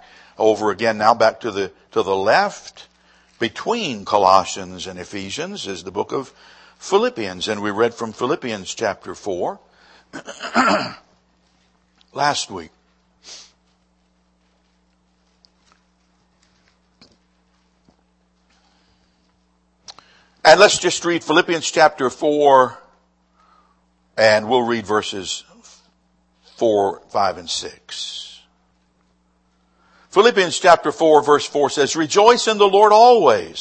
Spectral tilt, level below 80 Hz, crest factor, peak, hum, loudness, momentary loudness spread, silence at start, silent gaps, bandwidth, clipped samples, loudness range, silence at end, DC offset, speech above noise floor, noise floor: -3 dB/octave; -62 dBFS; 20 dB; 0 dBFS; none; -17 LUFS; 18 LU; 0.4 s; none; 9.2 kHz; under 0.1%; 9 LU; 0 s; under 0.1%; 45 dB; -62 dBFS